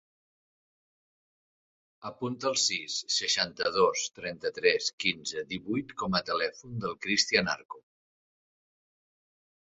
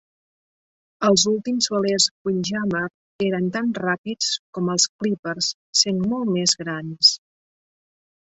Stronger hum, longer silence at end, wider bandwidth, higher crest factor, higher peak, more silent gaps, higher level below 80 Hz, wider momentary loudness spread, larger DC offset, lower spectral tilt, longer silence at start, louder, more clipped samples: neither; first, 1.9 s vs 1.15 s; about the same, 8.4 kHz vs 8.2 kHz; about the same, 24 dB vs 20 dB; second, -8 dBFS vs -2 dBFS; second, 4.93-4.98 s, 7.65-7.69 s vs 2.11-2.25 s, 2.94-3.19 s, 3.98-4.04 s, 4.39-4.53 s, 4.89-4.99 s, 5.19-5.23 s, 5.54-5.73 s; about the same, -66 dBFS vs -62 dBFS; about the same, 11 LU vs 9 LU; neither; about the same, -2.5 dB/octave vs -3 dB/octave; first, 2 s vs 1 s; second, -29 LUFS vs -21 LUFS; neither